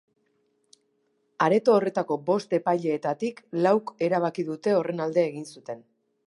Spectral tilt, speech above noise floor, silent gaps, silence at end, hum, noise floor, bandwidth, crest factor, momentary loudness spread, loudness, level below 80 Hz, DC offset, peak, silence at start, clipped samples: -6.5 dB/octave; 47 dB; none; 0.5 s; none; -71 dBFS; 11.5 kHz; 20 dB; 12 LU; -25 LUFS; -78 dBFS; under 0.1%; -6 dBFS; 1.4 s; under 0.1%